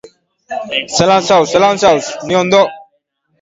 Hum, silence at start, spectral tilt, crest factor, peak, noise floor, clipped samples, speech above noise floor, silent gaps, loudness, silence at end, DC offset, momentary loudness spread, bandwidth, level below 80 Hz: none; 0.5 s; -3.5 dB/octave; 14 dB; 0 dBFS; -63 dBFS; under 0.1%; 51 dB; none; -12 LUFS; 0.6 s; under 0.1%; 9 LU; 8 kHz; -50 dBFS